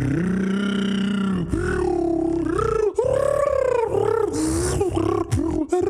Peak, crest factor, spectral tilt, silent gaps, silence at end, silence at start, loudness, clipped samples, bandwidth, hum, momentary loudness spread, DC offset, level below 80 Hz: -8 dBFS; 14 dB; -6.5 dB/octave; none; 0 s; 0 s; -22 LUFS; under 0.1%; 14 kHz; none; 3 LU; under 0.1%; -36 dBFS